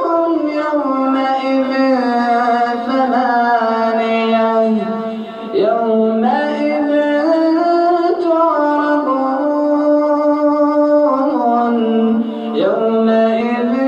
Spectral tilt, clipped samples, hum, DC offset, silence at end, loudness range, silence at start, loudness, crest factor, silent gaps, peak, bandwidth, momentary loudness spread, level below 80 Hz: -7 dB/octave; under 0.1%; none; under 0.1%; 0 s; 1 LU; 0 s; -14 LUFS; 10 dB; none; -4 dBFS; 8.2 kHz; 3 LU; -66 dBFS